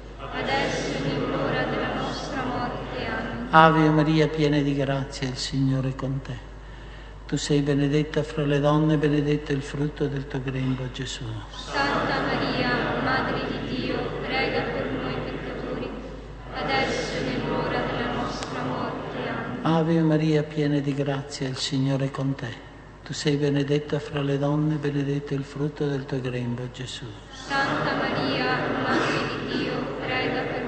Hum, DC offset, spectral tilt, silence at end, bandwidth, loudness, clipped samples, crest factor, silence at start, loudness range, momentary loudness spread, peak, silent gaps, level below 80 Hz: none; under 0.1%; -6 dB/octave; 0 s; 8.8 kHz; -25 LUFS; under 0.1%; 26 dB; 0 s; 6 LU; 11 LU; 0 dBFS; none; -44 dBFS